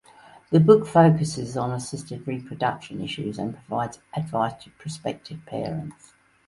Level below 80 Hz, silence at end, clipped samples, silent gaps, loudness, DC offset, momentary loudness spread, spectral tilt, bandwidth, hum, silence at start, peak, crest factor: -58 dBFS; 0.55 s; under 0.1%; none; -24 LUFS; under 0.1%; 17 LU; -7 dB/octave; 11.5 kHz; none; 0.5 s; -2 dBFS; 22 dB